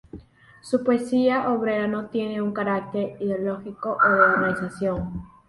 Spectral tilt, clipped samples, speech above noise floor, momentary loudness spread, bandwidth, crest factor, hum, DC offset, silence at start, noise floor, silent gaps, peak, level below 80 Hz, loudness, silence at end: -7 dB/octave; under 0.1%; 23 dB; 12 LU; 11.5 kHz; 20 dB; none; under 0.1%; 0.15 s; -46 dBFS; none; -4 dBFS; -52 dBFS; -23 LUFS; 0.2 s